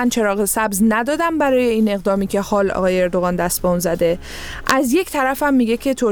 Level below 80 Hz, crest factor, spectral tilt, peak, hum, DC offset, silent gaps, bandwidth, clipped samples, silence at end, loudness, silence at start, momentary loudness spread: -38 dBFS; 16 dB; -4.5 dB/octave; 0 dBFS; none; under 0.1%; none; over 20 kHz; under 0.1%; 0 s; -18 LUFS; 0 s; 3 LU